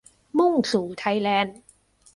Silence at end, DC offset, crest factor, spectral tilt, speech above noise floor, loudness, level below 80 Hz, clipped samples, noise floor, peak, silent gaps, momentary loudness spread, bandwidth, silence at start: 0.65 s; under 0.1%; 16 dB; -5 dB/octave; 35 dB; -23 LUFS; -64 dBFS; under 0.1%; -57 dBFS; -8 dBFS; none; 6 LU; 11.5 kHz; 0.35 s